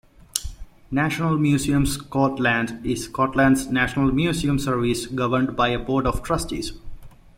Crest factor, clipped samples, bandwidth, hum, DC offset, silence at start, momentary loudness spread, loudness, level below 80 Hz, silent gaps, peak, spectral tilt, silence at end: 22 dB; under 0.1%; 16.5 kHz; none; under 0.1%; 0.35 s; 10 LU; -22 LUFS; -38 dBFS; none; -2 dBFS; -5.5 dB/octave; 0.3 s